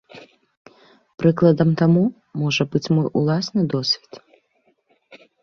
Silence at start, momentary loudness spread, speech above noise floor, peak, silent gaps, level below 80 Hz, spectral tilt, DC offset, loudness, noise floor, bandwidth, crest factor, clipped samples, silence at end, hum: 0.15 s; 6 LU; 46 dB; -4 dBFS; 0.57-0.65 s; -58 dBFS; -7 dB/octave; under 0.1%; -19 LUFS; -65 dBFS; 7.2 kHz; 18 dB; under 0.1%; 0.25 s; none